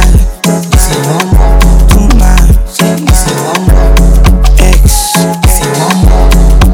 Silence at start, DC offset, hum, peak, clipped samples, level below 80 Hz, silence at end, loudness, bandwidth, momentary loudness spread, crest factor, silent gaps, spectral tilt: 0 s; under 0.1%; none; 0 dBFS; 20%; -6 dBFS; 0 s; -8 LUFS; 16.5 kHz; 3 LU; 4 dB; none; -5 dB/octave